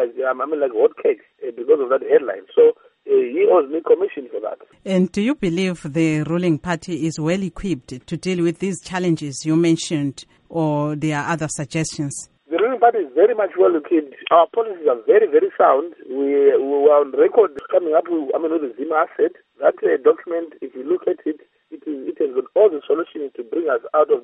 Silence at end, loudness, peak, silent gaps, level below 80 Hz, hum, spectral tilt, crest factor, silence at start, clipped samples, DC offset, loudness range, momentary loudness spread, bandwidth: 0.05 s; -19 LUFS; -2 dBFS; none; -56 dBFS; none; -6 dB/octave; 18 dB; 0 s; under 0.1%; under 0.1%; 6 LU; 12 LU; 11 kHz